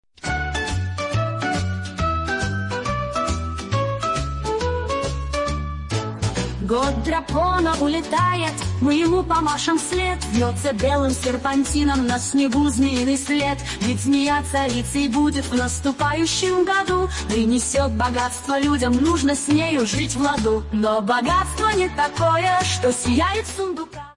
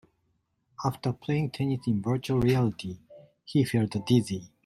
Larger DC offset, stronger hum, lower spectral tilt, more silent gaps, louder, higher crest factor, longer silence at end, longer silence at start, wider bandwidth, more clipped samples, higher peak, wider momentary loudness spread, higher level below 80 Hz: neither; neither; second, -4.5 dB/octave vs -7 dB/octave; neither; first, -21 LUFS vs -28 LUFS; about the same, 14 dB vs 18 dB; second, 0.05 s vs 0.2 s; second, 0.25 s vs 0.8 s; second, 11.5 kHz vs 13.5 kHz; neither; about the same, -8 dBFS vs -10 dBFS; second, 6 LU vs 9 LU; first, -34 dBFS vs -56 dBFS